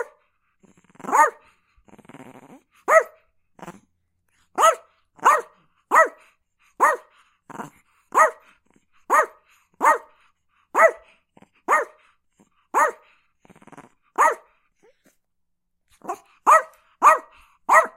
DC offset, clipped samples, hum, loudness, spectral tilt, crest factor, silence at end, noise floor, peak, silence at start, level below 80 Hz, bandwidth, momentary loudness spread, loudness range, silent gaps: under 0.1%; under 0.1%; none; -20 LUFS; -1.5 dB/octave; 24 dB; 0.1 s; -73 dBFS; 0 dBFS; 0 s; -74 dBFS; 16 kHz; 21 LU; 5 LU; none